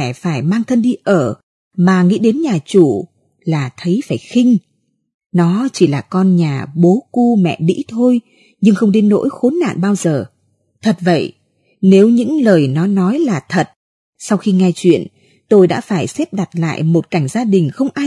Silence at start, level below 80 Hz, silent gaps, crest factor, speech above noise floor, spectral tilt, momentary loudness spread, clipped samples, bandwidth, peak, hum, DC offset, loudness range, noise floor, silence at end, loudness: 0 s; -62 dBFS; 1.43-1.71 s, 5.14-5.19 s, 5.26-5.30 s, 13.76-14.13 s; 14 dB; 48 dB; -7 dB/octave; 8 LU; under 0.1%; 12 kHz; 0 dBFS; none; under 0.1%; 2 LU; -61 dBFS; 0 s; -14 LUFS